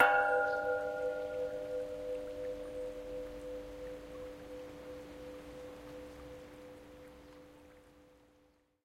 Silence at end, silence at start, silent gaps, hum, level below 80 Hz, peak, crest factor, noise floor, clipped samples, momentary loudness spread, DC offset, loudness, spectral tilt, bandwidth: 0.75 s; 0 s; none; none; -62 dBFS; -12 dBFS; 26 dB; -70 dBFS; under 0.1%; 21 LU; under 0.1%; -39 LUFS; -4.5 dB/octave; 16 kHz